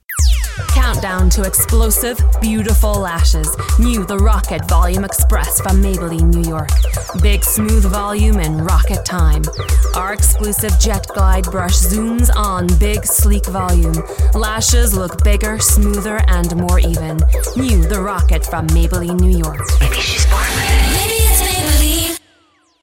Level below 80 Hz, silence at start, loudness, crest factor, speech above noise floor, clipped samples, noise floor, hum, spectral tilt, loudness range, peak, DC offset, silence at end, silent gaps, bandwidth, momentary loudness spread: -14 dBFS; 0.1 s; -14 LUFS; 12 dB; 42 dB; under 0.1%; -54 dBFS; none; -4.5 dB/octave; 1 LU; 0 dBFS; under 0.1%; 0.65 s; none; 17 kHz; 4 LU